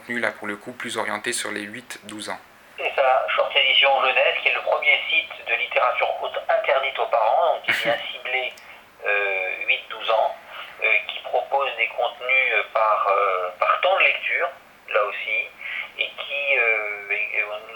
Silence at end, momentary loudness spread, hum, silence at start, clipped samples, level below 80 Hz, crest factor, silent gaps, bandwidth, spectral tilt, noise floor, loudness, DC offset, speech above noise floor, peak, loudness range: 0 s; 12 LU; none; 0 s; under 0.1%; -70 dBFS; 20 dB; none; 19.5 kHz; -1 dB/octave; -45 dBFS; -21 LUFS; under 0.1%; 23 dB; -4 dBFS; 4 LU